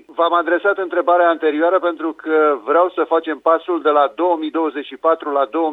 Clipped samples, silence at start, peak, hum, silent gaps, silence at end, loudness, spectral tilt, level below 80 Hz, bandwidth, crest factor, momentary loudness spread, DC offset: under 0.1%; 0.1 s; -2 dBFS; none; none; 0 s; -17 LUFS; -5.5 dB/octave; -72 dBFS; 4.1 kHz; 14 dB; 5 LU; under 0.1%